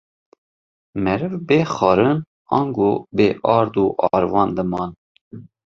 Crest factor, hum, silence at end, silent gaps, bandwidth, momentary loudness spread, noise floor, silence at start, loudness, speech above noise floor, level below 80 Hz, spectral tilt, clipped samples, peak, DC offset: 18 dB; none; 0.25 s; 2.27-2.45 s, 4.98-5.15 s, 5.21-5.31 s; 7.4 kHz; 8 LU; under -90 dBFS; 0.95 s; -19 LUFS; over 72 dB; -50 dBFS; -7.5 dB/octave; under 0.1%; -2 dBFS; under 0.1%